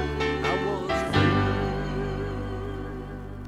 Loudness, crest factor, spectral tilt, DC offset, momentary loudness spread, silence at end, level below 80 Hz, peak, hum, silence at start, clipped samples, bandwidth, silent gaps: -27 LUFS; 18 dB; -6.5 dB/octave; under 0.1%; 13 LU; 0 s; -38 dBFS; -8 dBFS; none; 0 s; under 0.1%; 12 kHz; none